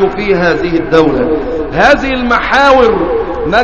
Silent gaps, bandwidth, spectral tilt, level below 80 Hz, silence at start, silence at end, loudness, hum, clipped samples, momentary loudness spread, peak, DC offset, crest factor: none; 8.4 kHz; -6 dB/octave; -28 dBFS; 0 s; 0 s; -10 LUFS; none; 0.5%; 7 LU; 0 dBFS; 3%; 10 dB